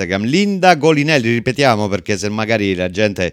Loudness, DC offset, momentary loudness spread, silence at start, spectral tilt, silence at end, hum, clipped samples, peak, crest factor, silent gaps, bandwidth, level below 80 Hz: -15 LUFS; under 0.1%; 7 LU; 0 s; -5.5 dB/octave; 0 s; none; under 0.1%; 0 dBFS; 14 dB; none; 15.5 kHz; -50 dBFS